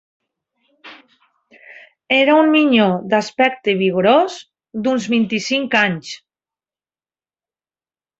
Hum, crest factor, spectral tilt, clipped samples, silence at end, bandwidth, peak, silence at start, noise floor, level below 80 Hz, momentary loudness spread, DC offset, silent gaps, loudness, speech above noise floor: none; 18 dB; -5 dB/octave; under 0.1%; 2.05 s; 8 kHz; 0 dBFS; 0.85 s; under -90 dBFS; -64 dBFS; 14 LU; under 0.1%; none; -16 LUFS; over 74 dB